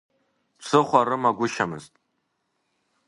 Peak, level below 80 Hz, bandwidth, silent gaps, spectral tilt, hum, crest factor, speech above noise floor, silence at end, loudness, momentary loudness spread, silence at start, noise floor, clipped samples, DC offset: -2 dBFS; -68 dBFS; 11.5 kHz; none; -5 dB/octave; none; 24 dB; 53 dB; 1.2 s; -22 LUFS; 16 LU; 0.6 s; -75 dBFS; under 0.1%; under 0.1%